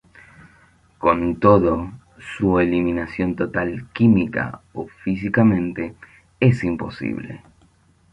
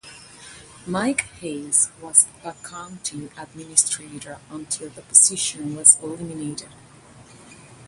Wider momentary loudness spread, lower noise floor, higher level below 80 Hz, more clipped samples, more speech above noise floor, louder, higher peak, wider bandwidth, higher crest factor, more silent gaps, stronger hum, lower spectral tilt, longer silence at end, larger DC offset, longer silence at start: second, 16 LU vs 23 LU; first, -56 dBFS vs -47 dBFS; first, -44 dBFS vs -60 dBFS; neither; first, 37 dB vs 24 dB; about the same, -20 LUFS vs -18 LUFS; about the same, -2 dBFS vs 0 dBFS; second, 9.2 kHz vs 16 kHz; second, 18 dB vs 24 dB; neither; neither; first, -9 dB/octave vs -1.5 dB/octave; first, 0.75 s vs 0 s; neither; first, 1 s vs 0.05 s